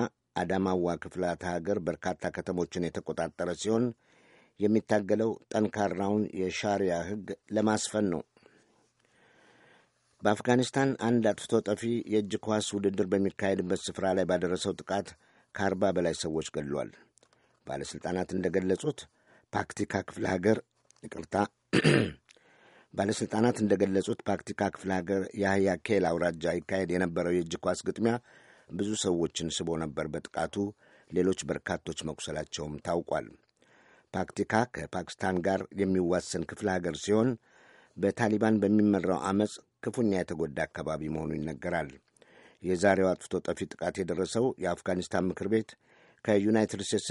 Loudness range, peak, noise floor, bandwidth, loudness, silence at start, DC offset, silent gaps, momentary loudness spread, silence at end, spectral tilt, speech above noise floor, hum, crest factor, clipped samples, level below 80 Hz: 5 LU; -10 dBFS; -69 dBFS; 11.5 kHz; -31 LUFS; 0 s; under 0.1%; none; 9 LU; 0 s; -5.5 dB/octave; 39 dB; none; 22 dB; under 0.1%; -60 dBFS